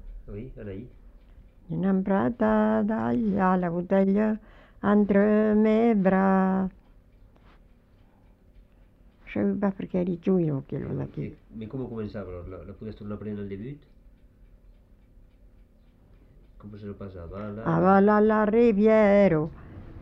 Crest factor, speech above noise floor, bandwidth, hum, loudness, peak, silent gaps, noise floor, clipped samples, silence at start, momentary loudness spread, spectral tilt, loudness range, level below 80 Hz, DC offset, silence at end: 18 dB; 33 dB; 5.6 kHz; none; -24 LUFS; -8 dBFS; none; -57 dBFS; under 0.1%; 0.05 s; 20 LU; -10 dB/octave; 17 LU; -50 dBFS; under 0.1%; 0 s